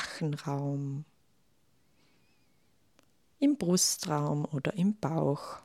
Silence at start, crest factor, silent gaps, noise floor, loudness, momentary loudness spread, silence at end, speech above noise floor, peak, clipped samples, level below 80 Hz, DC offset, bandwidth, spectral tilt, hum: 0 s; 18 dB; none; -72 dBFS; -31 LUFS; 9 LU; 0.05 s; 42 dB; -16 dBFS; under 0.1%; -70 dBFS; under 0.1%; 16 kHz; -4.5 dB/octave; none